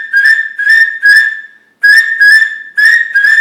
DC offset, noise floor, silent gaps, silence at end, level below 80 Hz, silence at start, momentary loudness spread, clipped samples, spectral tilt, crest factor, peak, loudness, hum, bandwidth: under 0.1%; -29 dBFS; none; 0 s; -66 dBFS; 0 s; 6 LU; under 0.1%; 4 dB/octave; 8 dB; 0 dBFS; -6 LUFS; none; 18.5 kHz